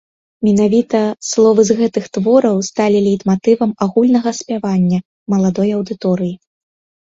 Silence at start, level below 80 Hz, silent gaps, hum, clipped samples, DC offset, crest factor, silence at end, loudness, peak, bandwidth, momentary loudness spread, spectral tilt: 0.4 s; -54 dBFS; 5.05-5.26 s; none; under 0.1%; under 0.1%; 14 dB; 0.65 s; -15 LUFS; 0 dBFS; 7.8 kHz; 7 LU; -6.5 dB/octave